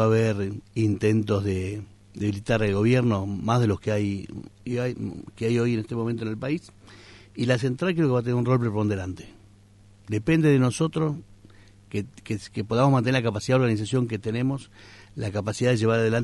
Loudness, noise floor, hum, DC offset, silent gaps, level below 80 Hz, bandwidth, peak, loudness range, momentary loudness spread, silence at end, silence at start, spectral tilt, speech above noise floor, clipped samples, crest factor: -25 LUFS; -53 dBFS; none; under 0.1%; none; -52 dBFS; 11.5 kHz; -8 dBFS; 3 LU; 13 LU; 0 s; 0 s; -7 dB/octave; 29 dB; under 0.1%; 16 dB